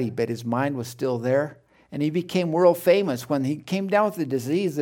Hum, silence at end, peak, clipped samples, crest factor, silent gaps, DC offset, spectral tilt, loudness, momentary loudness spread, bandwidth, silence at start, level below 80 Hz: none; 0 s; -4 dBFS; under 0.1%; 18 dB; none; under 0.1%; -6.5 dB/octave; -24 LUFS; 8 LU; 17.5 kHz; 0 s; -68 dBFS